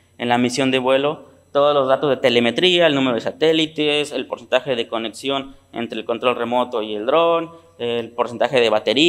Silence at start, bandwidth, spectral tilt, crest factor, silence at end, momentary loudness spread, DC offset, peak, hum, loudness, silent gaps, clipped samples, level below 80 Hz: 0.2 s; 14 kHz; -4.5 dB/octave; 18 dB; 0 s; 10 LU; under 0.1%; -2 dBFS; none; -19 LUFS; none; under 0.1%; -64 dBFS